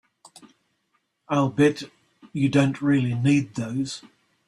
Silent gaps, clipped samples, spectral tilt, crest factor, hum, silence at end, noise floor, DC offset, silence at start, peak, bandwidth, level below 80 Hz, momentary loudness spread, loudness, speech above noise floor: none; under 0.1%; -6.5 dB/octave; 18 dB; none; 0.5 s; -72 dBFS; under 0.1%; 1.3 s; -6 dBFS; 11 kHz; -62 dBFS; 15 LU; -23 LUFS; 50 dB